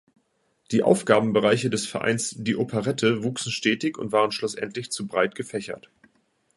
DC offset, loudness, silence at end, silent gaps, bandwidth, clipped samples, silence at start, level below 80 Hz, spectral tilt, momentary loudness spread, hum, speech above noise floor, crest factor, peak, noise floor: under 0.1%; -24 LUFS; 0.75 s; none; 11.5 kHz; under 0.1%; 0.7 s; -64 dBFS; -4.5 dB/octave; 11 LU; none; 45 dB; 22 dB; -2 dBFS; -69 dBFS